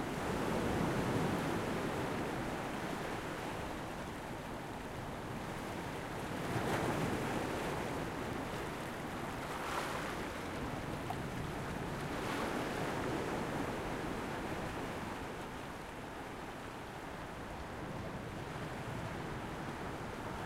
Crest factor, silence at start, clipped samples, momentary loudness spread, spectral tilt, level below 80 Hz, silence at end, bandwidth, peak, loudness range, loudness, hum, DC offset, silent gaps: 18 dB; 0 s; under 0.1%; 9 LU; -5.5 dB/octave; -54 dBFS; 0 s; 16 kHz; -22 dBFS; 6 LU; -40 LUFS; none; under 0.1%; none